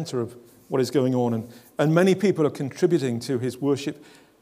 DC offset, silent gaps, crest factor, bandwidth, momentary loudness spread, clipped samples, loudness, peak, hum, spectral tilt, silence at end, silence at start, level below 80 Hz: under 0.1%; none; 20 dB; 16 kHz; 12 LU; under 0.1%; -24 LUFS; -4 dBFS; none; -6.5 dB/octave; 0.4 s; 0 s; -72 dBFS